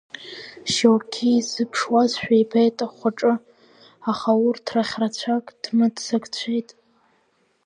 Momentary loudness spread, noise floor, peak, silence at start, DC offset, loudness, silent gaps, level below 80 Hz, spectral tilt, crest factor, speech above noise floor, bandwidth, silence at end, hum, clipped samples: 9 LU; -65 dBFS; -4 dBFS; 0.2 s; under 0.1%; -22 LUFS; none; -66 dBFS; -4.5 dB/octave; 20 dB; 44 dB; 10 kHz; 1.05 s; none; under 0.1%